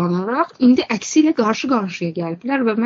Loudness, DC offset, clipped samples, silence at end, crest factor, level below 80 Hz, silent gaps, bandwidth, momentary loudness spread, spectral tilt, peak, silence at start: -18 LUFS; under 0.1%; under 0.1%; 0 s; 14 dB; -62 dBFS; none; 7.6 kHz; 9 LU; -5 dB/octave; -4 dBFS; 0 s